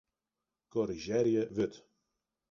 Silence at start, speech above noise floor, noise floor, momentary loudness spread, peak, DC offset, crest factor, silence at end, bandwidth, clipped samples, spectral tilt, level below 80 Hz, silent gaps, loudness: 0.75 s; 58 dB; -90 dBFS; 7 LU; -18 dBFS; under 0.1%; 18 dB; 0.75 s; 7.2 kHz; under 0.1%; -6.5 dB/octave; -66 dBFS; none; -33 LUFS